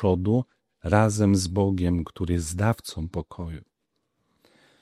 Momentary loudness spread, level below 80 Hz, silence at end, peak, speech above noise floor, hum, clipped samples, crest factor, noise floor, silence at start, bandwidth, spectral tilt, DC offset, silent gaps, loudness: 16 LU; -44 dBFS; 1.2 s; -4 dBFS; 53 dB; none; under 0.1%; 22 dB; -77 dBFS; 0 s; 14 kHz; -6.5 dB/octave; under 0.1%; none; -25 LUFS